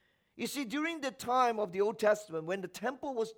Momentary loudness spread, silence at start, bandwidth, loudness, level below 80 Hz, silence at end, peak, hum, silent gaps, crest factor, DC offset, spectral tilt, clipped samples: 9 LU; 0.35 s; over 20 kHz; -34 LUFS; -76 dBFS; 0.05 s; -16 dBFS; none; none; 18 dB; under 0.1%; -4 dB/octave; under 0.1%